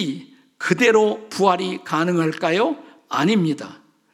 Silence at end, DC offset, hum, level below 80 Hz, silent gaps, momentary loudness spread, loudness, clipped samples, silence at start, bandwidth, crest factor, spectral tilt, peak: 0.4 s; under 0.1%; none; -72 dBFS; none; 13 LU; -20 LUFS; under 0.1%; 0 s; 14.5 kHz; 18 dB; -5.5 dB/octave; -2 dBFS